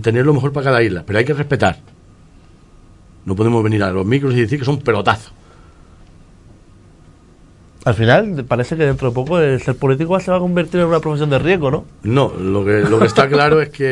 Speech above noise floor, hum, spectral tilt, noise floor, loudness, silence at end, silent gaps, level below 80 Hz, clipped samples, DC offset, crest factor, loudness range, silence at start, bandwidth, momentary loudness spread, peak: 30 dB; none; -7 dB/octave; -45 dBFS; -15 LUFS; 0 s; none; -42 dBFS; under 0.1%; under 0.1%; 16 dB; 6 LU; 0 s; 11 kHz; 7 LU; 0 dBFS